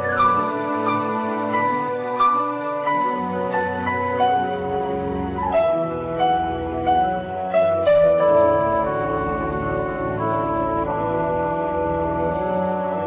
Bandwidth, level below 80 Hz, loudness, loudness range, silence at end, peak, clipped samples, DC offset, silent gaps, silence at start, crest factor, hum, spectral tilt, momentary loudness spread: 4 kHz; -42 dBFS; -21 LUFS; 4 LU; 0 s; -6 dBFS; under 0.1%; under 0.1%; none; 0 s; 14 dB; none; -10 dB/octave; 7 LU